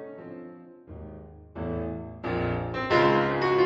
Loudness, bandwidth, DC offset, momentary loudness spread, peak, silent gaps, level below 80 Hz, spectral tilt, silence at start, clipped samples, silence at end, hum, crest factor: -27 LUFS; 7.8 kHz; under 0.1%; 23 LU; -10 dBFS; none; -48 dBFS; -7.5 dB/octave; 0 s; under 0.1%; 0 s; none; 18 dB